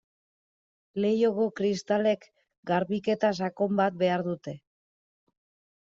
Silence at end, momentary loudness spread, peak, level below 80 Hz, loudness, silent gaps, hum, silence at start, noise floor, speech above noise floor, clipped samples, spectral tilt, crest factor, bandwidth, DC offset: 1.3 s; 12 LU; -12 dBFS; -72 dBFS; -27 LUFS; 2.58-2.63 s; none; 0.95 s; under -90 dBFS; over 63 dB; under 0.1%; -5 dB/octave; 18 dB; 7.8 kHz; under 0.1%